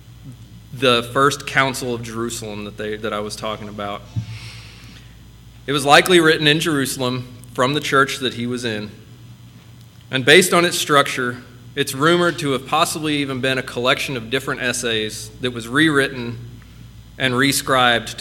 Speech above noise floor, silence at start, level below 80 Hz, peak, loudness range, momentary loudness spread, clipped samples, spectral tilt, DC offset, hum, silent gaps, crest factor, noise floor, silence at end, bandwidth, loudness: 24 dB; 0.05 s; -48 dBFS; 0 dBFS; 8 LU; 16 LU; under 0.1%; -3.5 dB/octave; under 0.1%; none; none; 20 dB; -43 dBFS; 0 s; 18 kHz; -18 LUFS